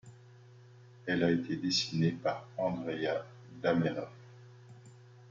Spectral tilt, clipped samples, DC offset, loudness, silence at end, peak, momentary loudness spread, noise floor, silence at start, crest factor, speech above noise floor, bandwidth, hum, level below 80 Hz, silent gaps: -5.5 dB/octave; under 0.1%; under 0.1%; -33 LUFS; 0 s; -14 dBFS; 24 LU; -56 dBFS; 0.05 s; 20 dB; 24 dB; 7.6 kHz; none; -68 dBFS; none